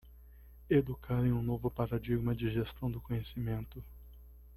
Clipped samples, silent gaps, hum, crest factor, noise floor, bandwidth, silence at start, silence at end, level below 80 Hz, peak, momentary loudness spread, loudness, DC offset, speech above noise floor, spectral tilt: under 0.1%; none; 60 Hz at -50 dBFS; 18 dB; -55 dBFS; 13.5 kHz; 0.05 s; 0 s; -50 dBFS; -16 dBFS; 9 LU; -35 LUFS; under 0.1%; 21 dB; -10 dB/octave